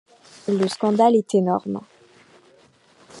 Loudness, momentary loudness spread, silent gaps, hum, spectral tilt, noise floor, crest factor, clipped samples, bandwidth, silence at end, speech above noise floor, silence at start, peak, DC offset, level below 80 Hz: -21 LUFS; 15 LU; none; none; -6.5 dB/octave; -55 dBFS; 18 dB; under 0.1%; 11.5 kHz; 0 s; 36 dB; 0.45 s; -4 dBFS; under 0.1%; -70 dBFS